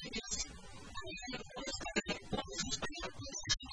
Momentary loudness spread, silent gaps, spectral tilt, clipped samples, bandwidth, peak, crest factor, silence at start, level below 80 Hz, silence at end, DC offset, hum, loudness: 8 LU; none; -2 dB/octave; under 0.1%; 10.5 kHz; -20 dBFS; 22 dB; 0 s; -54 dBFS; 0 s; under 0.1%; none; -41 LUFS